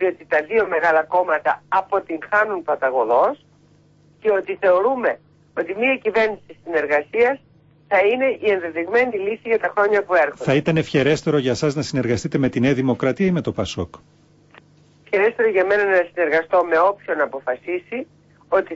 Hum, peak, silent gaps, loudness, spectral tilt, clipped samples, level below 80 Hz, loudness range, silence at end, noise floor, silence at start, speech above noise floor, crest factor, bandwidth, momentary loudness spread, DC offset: none; -6 dBFS; none; -19 LUFS; -6 dB/octave; under 0.1%; -54 dBFS; 2 LU; 0 s; -54 dBFS; 0 s; 35 dB; 14 dB; 8 kHz; 9 LU; under 0.1%